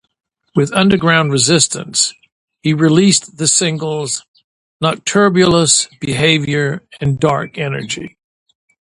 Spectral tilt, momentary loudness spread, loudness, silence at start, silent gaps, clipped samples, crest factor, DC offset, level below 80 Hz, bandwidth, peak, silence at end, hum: -3.5 dB/octave; 10 LU; -14 LUFS; 0.55 s; 2.32-2.48 s, 4.28-4.34 s, 4.44-4.80 s; under 0.1%; 16 dB; under 0.1%; -48 dBFS; 11.5 kHz; 0 dBFS; 0.85 s; none